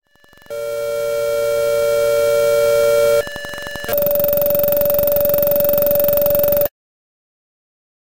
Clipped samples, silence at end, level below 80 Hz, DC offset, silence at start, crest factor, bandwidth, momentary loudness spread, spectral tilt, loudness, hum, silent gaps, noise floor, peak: under 0.1%; 1.45 s; -44 dBFS; 1%; 0 s; 14 dB; 17.5 kHz; 10 LU; -4 dB/octave; -16 LUFS; none; none; -48 dBFS; -4 dBFS